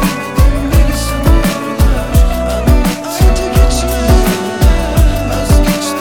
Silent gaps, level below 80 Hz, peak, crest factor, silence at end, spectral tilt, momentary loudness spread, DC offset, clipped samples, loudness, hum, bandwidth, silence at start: none; -12 dBFS; 0 dBFS; 10 dB; 0 s; -5.5 dB/octave; 3 LU; 0.6%; under 0.1%; -12 LUFS; none; 18.5 kHz; 0 s